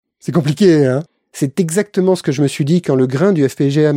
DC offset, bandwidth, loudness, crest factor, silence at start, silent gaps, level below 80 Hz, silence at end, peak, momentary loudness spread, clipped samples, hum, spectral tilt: under 0.1%; 16 kHz; -15 LUFS; 14 dB; 0.25 s; none; -58 dBFS; 0 s; -2 dBFS; 8 LU; under 0.1%; none; -6.5 dB/octave